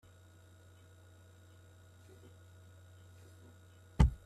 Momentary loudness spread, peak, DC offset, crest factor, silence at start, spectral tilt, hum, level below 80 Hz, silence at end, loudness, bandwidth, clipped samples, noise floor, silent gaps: 10 LU; -10 dBFS; under 0.1%; 30 dB; 4 s; -7.5 dB/octave; none; -42 dBFS; 0.1 s; -34 LUFS; 11.5 kHz; under 0.1%; -60 dBFS; none